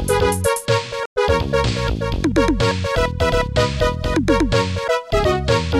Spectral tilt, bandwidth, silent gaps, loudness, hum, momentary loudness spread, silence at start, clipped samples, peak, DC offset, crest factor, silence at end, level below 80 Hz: -5 dB/octave; 15 kHz; 1.06-1.16 s; -19 LUFS; none; 4 LU; 0 s; under 0.1%; -2 dBFS; under 0.1%; 16 dB; 0 s; -28 dBFS